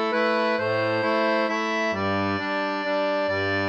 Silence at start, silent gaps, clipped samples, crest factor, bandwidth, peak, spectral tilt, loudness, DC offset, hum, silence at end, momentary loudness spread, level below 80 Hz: 0 s; none; under 0.1%; 12 dB; 8.4 kHz; -10 dBFS; -5.5 dB/octave; -24 LUFS; under 0.1%; none; 0 s; 3 LU; -70 dBFS